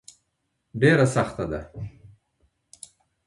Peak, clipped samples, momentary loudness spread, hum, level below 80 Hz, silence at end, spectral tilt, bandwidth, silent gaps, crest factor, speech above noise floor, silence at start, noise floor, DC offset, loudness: -6 dBFS; under 0.1%; 27 LU; none; -50 dBFS; 1.2 s; -6.5 dB/octave; 11.5 kHz; none; 20 dB; 54 dB; 0.75 s; -76 dBFS; under 0.1%; -22 LUFS